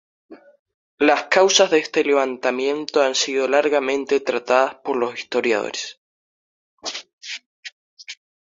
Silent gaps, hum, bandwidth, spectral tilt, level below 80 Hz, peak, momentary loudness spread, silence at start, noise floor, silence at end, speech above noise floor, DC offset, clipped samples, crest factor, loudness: 0.59-0.66 s, 0.74-0.98 s, 5.97-6.77 s, 7.13-7.18 s, 7.46-7.63 s, 7.72-7.97 s; none; 7.8 kHz; -1.5 dB/octave; -68 dBFS; 0 dBFS; 17 LU; 0.3 s; under -90 dBFS; 0.3 s; over 71 dB; under 0.1%; under 0.1%; 20 dB; -19 LUFS